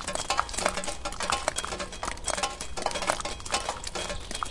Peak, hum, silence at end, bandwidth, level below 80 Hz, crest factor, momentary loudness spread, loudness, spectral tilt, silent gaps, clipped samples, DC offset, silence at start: -6 dBFS; none; 0 s; 11.5 kHz; -44 dBFS; 26 dB; 6 LU; -30 LUFS; -1.5 dB/octave; none; under 0.1%; under 0.1%; 0 s